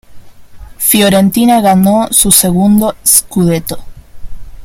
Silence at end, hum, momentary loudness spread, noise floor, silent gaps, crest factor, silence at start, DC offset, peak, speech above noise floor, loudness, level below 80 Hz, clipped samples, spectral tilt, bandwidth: 0 s; none; 7 LU; -31 dBFS; none; 10 dB; 0.1 s; under 0.1%; 0 dBFS; 23 dB; -8 LUFS; -32 dBFS; 0.4%; -4 dB/octave; over 20 kHz